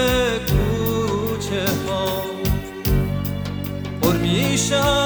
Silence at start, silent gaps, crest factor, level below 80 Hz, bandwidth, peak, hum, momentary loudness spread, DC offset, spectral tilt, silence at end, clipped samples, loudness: 0 s; none; 16 dB; -30 dBFS; over 20 kHz; -4 dBFS; none; 7 LU; under 0.1%; -5 dB/octave; 0 s; under 0.1%; -21 LUFS